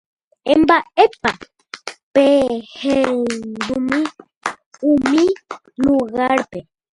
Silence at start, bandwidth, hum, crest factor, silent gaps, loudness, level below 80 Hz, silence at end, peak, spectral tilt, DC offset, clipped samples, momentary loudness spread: 0.45 s; 11.5 kHz; none; 18 dB; 2.03-2.12 s, 4.37-4.41 s, 4.66-4.71 s; -17 LUFS; -50 dBFS; 0.35 s; 0 dBFS; -4.5 dB/octave; under 0.1%; under 0.1%; 18 LU